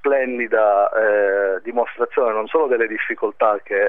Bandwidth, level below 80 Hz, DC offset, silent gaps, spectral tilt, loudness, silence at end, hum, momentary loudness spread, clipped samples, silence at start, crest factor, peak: 3.8 kHz; -68 dBFS; 0.7%; none; -7 dB/octave; -19 LUFS; 0 s; none; 6 LU; under 0.1%; 0.05 s; 14 dB; -4 dBFS